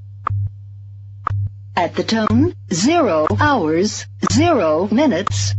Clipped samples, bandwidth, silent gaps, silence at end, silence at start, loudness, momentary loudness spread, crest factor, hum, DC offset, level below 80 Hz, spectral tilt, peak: under 0.1%; 8.2 kHz; none; 0 s; 0 s; -17 LUFS; 13 LU; 14 dB; none; under 0.1%; -44 dBFS; -5.5 dB/octave; -4 dBFS